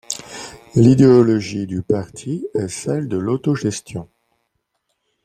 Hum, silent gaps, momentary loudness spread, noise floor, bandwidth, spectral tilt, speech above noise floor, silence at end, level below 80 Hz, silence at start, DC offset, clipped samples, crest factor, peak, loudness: none; none; 18 LU; -72 dBFS; 13.5 kHz; -7 dB/octave; 55 dB; 1.2 s; -52 dBFS; 0.1 s; under 0.1%; under 0.1%; 16 dB; -2 dBFS; -18 LUFS